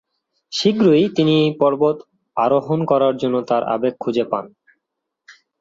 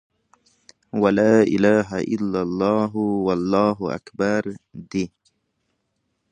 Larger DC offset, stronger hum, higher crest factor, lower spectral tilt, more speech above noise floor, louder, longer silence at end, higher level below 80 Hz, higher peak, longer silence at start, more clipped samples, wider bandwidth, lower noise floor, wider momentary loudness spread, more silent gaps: neither; neither; about the same, 16 dB vs 18 dB; about the same, -6.5 dB/octave vs -7 dB/octave; first, 62 dB vs 53 dB; first, -18 LUFS vs -21 LUFS; second, 0.3 s vs 1.25 s; second, -64 dBFS vs -56 dBFS; about the same, -2 dBFS vs -4 dBFS; second, 0.5 s vs 0.95 s; neither; second, 7.8 kHz vs 9.4 kHz; first, -79 dBFS vs -73 dBFS; second, 9 LU vs 13 LU; neither